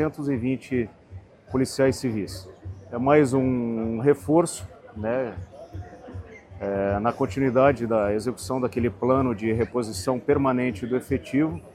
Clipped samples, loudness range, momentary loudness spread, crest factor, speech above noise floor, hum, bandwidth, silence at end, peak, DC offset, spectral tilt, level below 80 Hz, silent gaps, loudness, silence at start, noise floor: under 0.1%; 4 LU; 20 LU; 20 dB; 21 dB; none; 14.5 kHz; 0.05 s; -4 dBFS; under 0.1%; -6.5 dB/octave; -50 dBFS; none; -24 LUFS; 0 s; -45 dBFS